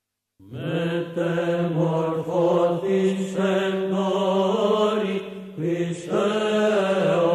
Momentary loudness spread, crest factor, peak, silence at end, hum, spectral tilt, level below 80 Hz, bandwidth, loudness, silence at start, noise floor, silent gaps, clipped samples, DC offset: 7 LU; 14 dB; -10 dBFS; 0 s; none; -6.5 dB/octave; -66 dBFS; 13 kHz; -23 LUFS; 0.45 s; -53 dBFS; none; under 0.1%; under 0.1%